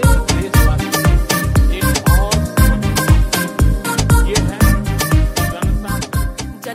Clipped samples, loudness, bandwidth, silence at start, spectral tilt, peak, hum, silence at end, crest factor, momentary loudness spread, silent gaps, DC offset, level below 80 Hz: under 0.1%; -15 LUFS; 16.5 kHz; 0 s; -5 dB/octave; 0 dBFS; none; 0 s; 14 dB; 6 LU; none; under 0.1%; -16 dBFS